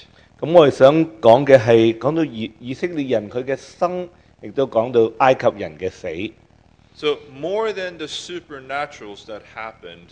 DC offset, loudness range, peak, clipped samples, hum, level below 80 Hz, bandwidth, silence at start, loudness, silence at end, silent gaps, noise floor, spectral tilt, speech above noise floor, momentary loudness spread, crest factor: under 0.1%; 11 LU; 0 dBFS; under 0.1%; none; -56 dBFS; 9.2 kHz; 0.4 s; -18 LUFS; 0.15 s; none; -53 dBFS; -6.5 dB/octave; 34 dB; 19 LU; 18 dB